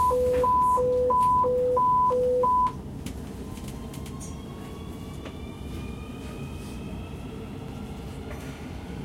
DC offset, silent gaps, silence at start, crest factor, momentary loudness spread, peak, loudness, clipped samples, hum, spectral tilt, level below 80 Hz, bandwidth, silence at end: under 0.1%; none; 0 s; 14 dB; 17 LU; -14 dBFS; -25 LUFS; under 0.1%; none; -6.5 dB/octave; -42 dBFS; 16 kHz; 0 s